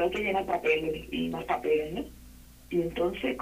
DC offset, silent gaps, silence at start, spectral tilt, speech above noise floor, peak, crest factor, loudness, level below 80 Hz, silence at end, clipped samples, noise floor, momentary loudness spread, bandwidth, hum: under 0.1%; none; 0 s; -6 dB/octave; 21 dB; -12 dBFS; 18 dB; -30 LUFS; -50 dBFS; 0 s; under 0.1%; -51 dBFS; 7 LU; 15.5 kHz; none